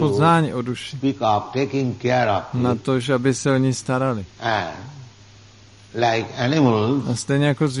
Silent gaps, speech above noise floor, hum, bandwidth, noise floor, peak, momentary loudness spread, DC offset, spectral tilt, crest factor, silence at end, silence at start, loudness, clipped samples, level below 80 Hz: none; 27 dB; none; 11.5 kHz; -47 dBFS; -4 dBFS; 8 LU; under 0.1%; -6 dB/octave; 16 dB; 0 s; 0 s; -21 LUFS; under 0.1%; -56 dBFS